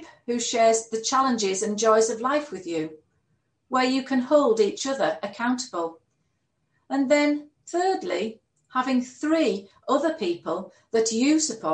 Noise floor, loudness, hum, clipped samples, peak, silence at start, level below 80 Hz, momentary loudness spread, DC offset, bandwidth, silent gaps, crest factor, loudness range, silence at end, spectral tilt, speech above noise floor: -74 dBFS; -24 LUFS; none; under 0.1%; -6 dBFS; 0 s; -74 dBFS; 11 LU; under 0.1%; 10 kHz; none; 18 dB; 3 LU; 0 s; -3 dB/octave; 50 dB